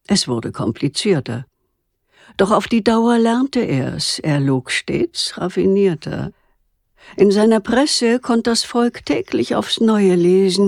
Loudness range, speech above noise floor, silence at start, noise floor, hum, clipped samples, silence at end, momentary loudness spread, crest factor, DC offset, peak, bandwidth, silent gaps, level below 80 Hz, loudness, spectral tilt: 3 LU; 53 dB; 0.1 s; -69 dBFS; none; under 0.1%; 0 s; 8 LU; 14 dB; under 0.1%; -2 dBFS; 13.5 kHz; none; -50 dBFS; -17 LUFS; -5 dB/octave